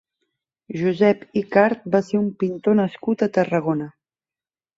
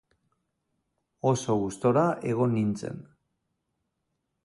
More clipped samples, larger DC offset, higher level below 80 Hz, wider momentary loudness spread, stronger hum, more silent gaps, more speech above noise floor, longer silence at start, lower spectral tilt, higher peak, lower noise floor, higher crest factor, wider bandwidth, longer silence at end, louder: neither; neither; about the same, -64 dBFS vs -62 dBFS; second, 7 LU vs 12 LU; neither; neither; first, over 70 dB vs 54 dB; second, 0.7 s vs 1.25 s; about the same, -8 dB/octave vs -7 dB/octave; first, -2 dBFS vs -10 dBFS; first, under -90 dBFS vs -80 dBFS; about the same, 20 dB vs 20 dB; second, 7.8 kHz vs 11.5 kHz; second, 0.85 s vs 1.4 s; first, -21 LUFS vs -27 LUFS